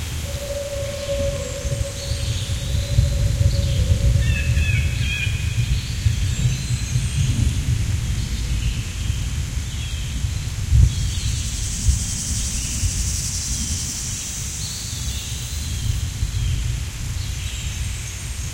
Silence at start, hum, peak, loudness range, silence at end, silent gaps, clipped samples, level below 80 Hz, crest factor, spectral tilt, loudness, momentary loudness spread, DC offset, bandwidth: 0 s; none; -2 dBFS; 5 LU; 0 s; none; under 0.1%; -26 dBFS; 18 dB; -4 dB/octave; -23 LUFS; 7 LU; under 0.1%; 16.5 kHz